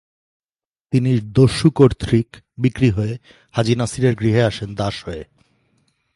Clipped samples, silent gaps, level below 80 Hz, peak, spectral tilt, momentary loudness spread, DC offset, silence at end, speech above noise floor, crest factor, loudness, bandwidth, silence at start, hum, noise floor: under 0.1%; none; -40 dBFS; 0 dBFS; -7 dB/octave; 14 LU; under 0.1%; 0.9 s; over 73 dB; 18 dB; -18 LUFS; 11.5 kHz; 0.9 s; none; under -90 dBFS